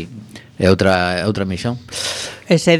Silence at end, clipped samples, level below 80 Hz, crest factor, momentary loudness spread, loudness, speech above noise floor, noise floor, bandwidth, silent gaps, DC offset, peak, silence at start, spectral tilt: 0 s; under 0.1%; -46 dBFS; 18 dB; 16 LU; -18 LUFS; 21 dB; -36 dBFS; 15 kHz; none; under 0.1%; 0 dBFS; 0 s; -5 dB/octave